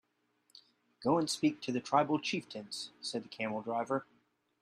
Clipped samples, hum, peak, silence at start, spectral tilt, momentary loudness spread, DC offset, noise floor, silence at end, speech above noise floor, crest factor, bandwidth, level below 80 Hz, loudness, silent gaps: under 0.1%; none; -14 dBFS; 1 s; -4.5 dB/octave; 10 LU; under 0.1%; -76 dBFS; 0.6 s; 42 dB; 22 dB; 13 kHz; -80 dBFS; -35 LUFS; none